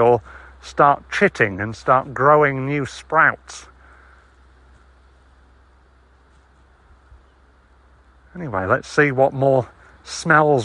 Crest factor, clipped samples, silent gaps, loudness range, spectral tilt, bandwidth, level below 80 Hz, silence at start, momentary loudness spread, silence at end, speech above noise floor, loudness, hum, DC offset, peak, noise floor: 20 dB; under 0.1%; none; 9 LU; -6 dB/octave; 11.5 kHz; -50 dBFS; 0 s; 18 LU; 0 s; 35 dB; -18 LUFS; none; under 0.1%; -2 dBFS; -53 dBFS